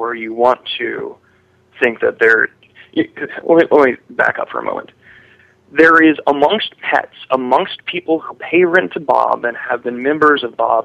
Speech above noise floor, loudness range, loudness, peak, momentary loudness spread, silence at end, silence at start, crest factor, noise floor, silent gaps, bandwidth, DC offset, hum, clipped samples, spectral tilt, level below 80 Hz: 39 dB; 3 LU; -15 LUFS; 0 dBFS; 11 LU; 0 s; 0 s; 16 dB; -53 dBFS; none; 8.4 kHz; under 0.1%; none; under 0.1%; -6 dB/octave; -62 dBFS